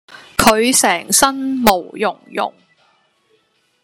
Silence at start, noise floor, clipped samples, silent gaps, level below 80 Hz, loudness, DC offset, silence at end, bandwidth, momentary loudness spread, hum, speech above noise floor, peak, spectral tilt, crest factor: 0.4 s; -61 dBFS; under 0.1%; none; -44 dBFS; -15 LUFS; under 0.1%; 1.35 s; 16.5 kHz; 11 LU; none; 45 dB; 0 dBFS; -2 dB/octave; 18 dB